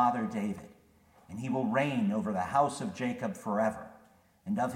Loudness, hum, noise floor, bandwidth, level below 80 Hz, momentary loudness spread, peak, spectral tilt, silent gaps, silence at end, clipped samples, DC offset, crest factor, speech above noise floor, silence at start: -32 LUFS; none; -62 dBFS; 15.5 kHz; -68 dBFS; 16 LU; -14 dBFS; -6.5 dB/octave; none; 0 s; under 0.1%; under 0.1%; 18 dB; 31 dB; 0 s